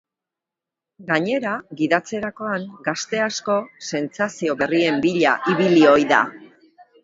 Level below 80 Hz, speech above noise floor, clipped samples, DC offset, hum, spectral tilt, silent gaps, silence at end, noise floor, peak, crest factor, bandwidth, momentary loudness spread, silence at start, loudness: -64 dBFS; 67 dB; under 0.1%; under 0.1%; none; -5 dB/octave; none; 0.6 s; -87 dBFS; 0 dBFS; 20 dB; 7.8 kHz; 12 LU; 1 s; -20 LUFS